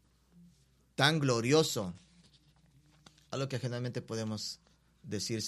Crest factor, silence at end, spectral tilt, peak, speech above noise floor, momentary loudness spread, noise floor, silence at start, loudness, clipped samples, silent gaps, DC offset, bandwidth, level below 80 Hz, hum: 26 dB; 0 s; -4.5 dB/octave; -8 dBFS; 35 dB; 15 LU; -67 dBFS; 1 s; -33 LUFS; under 0.1%; none; under 0.1%; 14.5 kHz; -70 dBFS; none